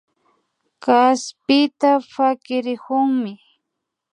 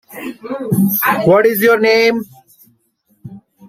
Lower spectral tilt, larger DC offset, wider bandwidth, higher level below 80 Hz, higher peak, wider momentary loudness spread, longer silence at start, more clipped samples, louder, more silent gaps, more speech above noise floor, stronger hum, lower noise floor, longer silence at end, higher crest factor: second, -3.5 dB/octave vs -5.5 dB/octave; neither; second, 10 kHz vs 16 kHz; second, -74 dBFS vs -56 dBFS; about the same, -2 dBFS vs 0 dBFS; second, 9 LU vs 17 LU; first, 0.85 s vs 0.1 s; neither; second, -19 LUFS vs -13 LUFS; neither; first, 62 dB vs 47 dB; neither; first, -80 dBFS vs -60 dBFS; first, 0.75 s vs 0 s; about the same, 18 dB vs 14 dB